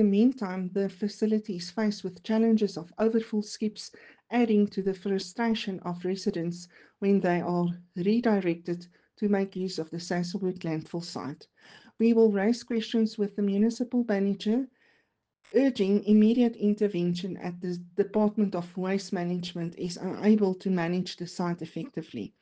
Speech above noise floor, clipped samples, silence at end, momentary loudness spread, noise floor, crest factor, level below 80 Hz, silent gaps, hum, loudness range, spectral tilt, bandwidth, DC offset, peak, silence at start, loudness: 46 dB; under 0.1%; 0.15 s; 12 LU; -73 dBFS; 16 dB; -70 dBFS; none; none; 4 LU; -7 dB/octave; 9 kHz; under 0.1%; -12 dBFS; 0 s; -28 LUFS